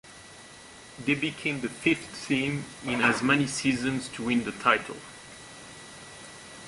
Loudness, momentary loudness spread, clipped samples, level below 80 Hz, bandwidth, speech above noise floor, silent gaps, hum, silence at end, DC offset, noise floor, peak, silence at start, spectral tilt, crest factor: -27 LUFS; 21 LU; under 0.1%; -60 dBFS; 11.5 kHz; 21 dB; none; none; 0 s; under 0.1%; -48 dBFS; -6 dBFS; 0.05 s; -4 dB/octave; 24 dB